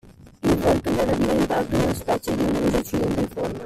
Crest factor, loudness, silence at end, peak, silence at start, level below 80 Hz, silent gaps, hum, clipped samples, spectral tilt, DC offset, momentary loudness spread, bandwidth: 16 dB; -22 LUFS; 0 s; -8 dBFS; 0.05 s; -38 dBFS; none; none; under 0.1%; -6 dB/octave; under 0.1%; 4 LU; 16 kHz